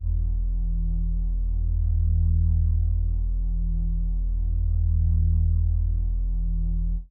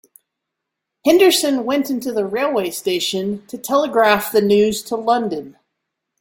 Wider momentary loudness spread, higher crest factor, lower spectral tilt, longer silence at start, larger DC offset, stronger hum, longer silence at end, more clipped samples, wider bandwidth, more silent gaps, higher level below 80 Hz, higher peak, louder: second, 6 LU vs 9 LU; second, 10 dB vs 16 dB; first, -17.5 dB/octave vs -3.5 dB/octave; second, 0 s vs 1.05 s; neither; neither; second, 0.05 s vs 0.7 s; neither; second, 0.8 kHz vs 17 kHz; neither; first, -24 dBFS vs -60 dBFS; second, -14 dBFS vs -2 dBFS; second, -26 LUFS vs -17 LUFS